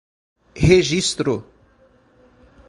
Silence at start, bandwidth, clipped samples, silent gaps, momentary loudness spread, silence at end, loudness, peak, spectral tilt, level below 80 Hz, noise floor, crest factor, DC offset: 0.55 s; 11.5 kHz; under 0.1%; none; 9 LU; 1.25 s; -18 LUFS; 0 dBFS; -5 dB/octave; -38 dBFS; -55 dBFS; 20 dB; under 0.1%